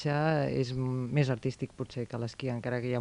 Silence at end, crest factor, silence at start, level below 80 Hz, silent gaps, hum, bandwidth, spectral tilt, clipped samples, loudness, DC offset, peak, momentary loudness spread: 0 s; 18 dB; 0 s; -58 dBFS; none; none; 10.5 kHz; -7.5 dB/octave; under 0.1%; -32 LUFS; under 0.1%; -12 dBFS; 9 LU